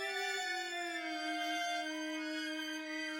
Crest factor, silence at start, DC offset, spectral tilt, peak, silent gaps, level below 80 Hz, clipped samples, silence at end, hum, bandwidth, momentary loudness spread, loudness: 14 dB; 0 s; under 0.1%; 0 dB/octave; -26 dBFS; none; under -90 dBFS; under 0.1%; 0 s; none; 18 kHz; 4 LU; -38 LUFS